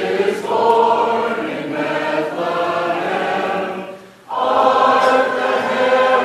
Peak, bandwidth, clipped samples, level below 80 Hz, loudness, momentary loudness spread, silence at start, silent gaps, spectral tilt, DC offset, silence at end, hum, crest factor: 0 dBFS; 13.5 kHz; under 0.1%; -68 dBFS; -17 LUFS; 9 LU; 0 s; none; -4.5 dB/octave; under 0.1%; 0 s; none; 16 dB